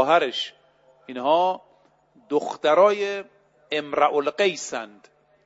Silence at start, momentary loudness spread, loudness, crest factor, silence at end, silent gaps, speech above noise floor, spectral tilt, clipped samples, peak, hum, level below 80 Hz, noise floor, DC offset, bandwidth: 0 s; 16 LU; -23 LUFS; 18 dB; 0.55 s; none; 37 dB; -3 dB/octave; under 0.1%; -6 dBFS; none; -74 dBFS; -59 dBFS; under 0.1%; 8 kHz